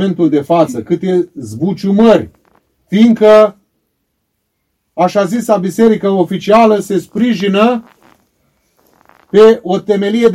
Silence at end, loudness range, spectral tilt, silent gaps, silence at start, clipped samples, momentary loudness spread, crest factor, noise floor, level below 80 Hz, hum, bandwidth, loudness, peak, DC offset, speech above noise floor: 0 s; 2 LU; -6.5 dB/octave; none; 0 s; 1%; 10 LU; 12 dB; -67 dBFS; -52 dBFS; none; 14 kHz; -11 LUFS; 0 dBFS; under 0.1%; 57 dB